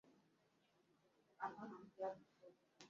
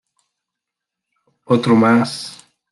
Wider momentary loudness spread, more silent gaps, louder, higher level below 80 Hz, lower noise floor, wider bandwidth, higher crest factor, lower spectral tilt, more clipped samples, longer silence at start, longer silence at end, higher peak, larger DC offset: about the same, 18 LU vs 16 LU; neither; second, -52 LUFS vs -15 LUFS; second, under -90 dBFS vs -64 dBFS; about the same, -80 dBFS vs -83 dBFS; second, 7.2 kHz vs 12 kHz; first, 22 dB vs 16 dB; second, -4 dB/octave vs -6 dB/octave; neither; second, 0.05 s vs 1.5 s; second, 0 s vs 0.4 s; second, -34 dBFS vs -4 dBFS; neither